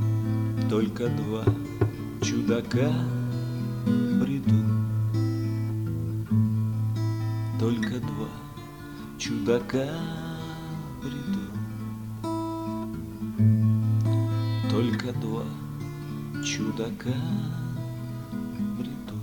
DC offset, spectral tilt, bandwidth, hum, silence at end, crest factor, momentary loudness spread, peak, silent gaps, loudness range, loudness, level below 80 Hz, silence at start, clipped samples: under 0.1%; -7 dB/octave; 18.5 kHz; none; 0 s; 16 dB; 11 LU; -10 dBFS; none; 5 LU; -28 LUFS; -50 dBFS; 0 s; under 0.1%